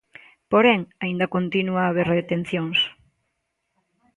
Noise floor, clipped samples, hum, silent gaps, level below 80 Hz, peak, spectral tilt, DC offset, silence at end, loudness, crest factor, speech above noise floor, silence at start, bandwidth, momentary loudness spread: -76 dBFS; under 0.1%; none; none; -62 dBFS; -4 dBFS; -7 dB/octave; under 0.1%; 1.25 s; -22 LUFS; 20 dB; 55 dB; 0.5 s; 11 kHz; 8 LU